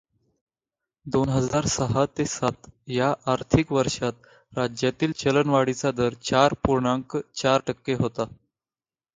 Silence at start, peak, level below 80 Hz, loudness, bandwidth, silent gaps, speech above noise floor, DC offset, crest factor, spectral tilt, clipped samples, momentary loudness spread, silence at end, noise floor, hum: 1.05 s; -4 dBFS; -48 dBFS; -24 LUFS; 9.6 kHz; none; over 66 dB; under 0.1%; 22 dB; -5 dB/octave; under 0.1%; 8 LU; 0.9 s; under -90 dBFS; none